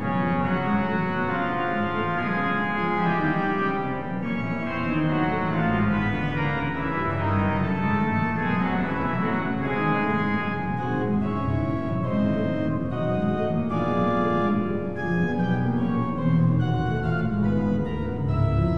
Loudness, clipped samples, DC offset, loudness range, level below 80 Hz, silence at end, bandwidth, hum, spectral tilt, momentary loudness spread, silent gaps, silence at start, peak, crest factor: -25 LUFS; under 0.1%; 1%; 1 LU; -42 dBFS; 0 s; 6.6 kHz; none; -9 dB/octave; 4 LU; none; 0 s; -10 dBFS; 14 dB